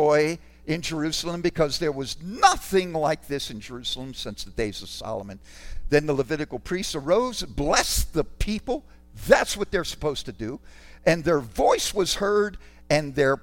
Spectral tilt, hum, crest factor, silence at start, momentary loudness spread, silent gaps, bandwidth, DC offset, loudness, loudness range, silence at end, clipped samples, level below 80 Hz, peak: -4 dB/octave; none; 22 dB; 0 s; 13 LU; none; 17 kHz; under 0.1%; -25 LUFS; 5 LU; 0.05 s; under 0.1%; -40 dBFS; -2 dBFS